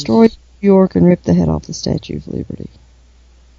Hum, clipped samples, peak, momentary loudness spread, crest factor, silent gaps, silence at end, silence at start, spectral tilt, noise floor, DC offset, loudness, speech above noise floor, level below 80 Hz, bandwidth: none; under 0.1%; 0 dBFS; 16 LU; 14 dB; none; 0.9 s; 0 s; -7.5 dB/octave; -46 dBFS; under 0.1%; -15 LUFS; 32 dB; -38 dBFS; 7.6 kHz